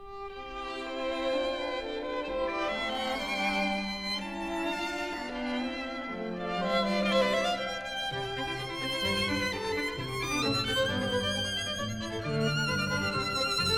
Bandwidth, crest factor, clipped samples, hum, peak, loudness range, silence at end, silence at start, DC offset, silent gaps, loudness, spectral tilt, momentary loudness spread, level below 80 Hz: 18.5 kHz; 16 dB; under 0.1%; none; -14 dBFS; 3 LU; 0 s; 0 s; 0.1%; none; -31 LUFS; -4 dB/octave; 7 LU; -52 dBFS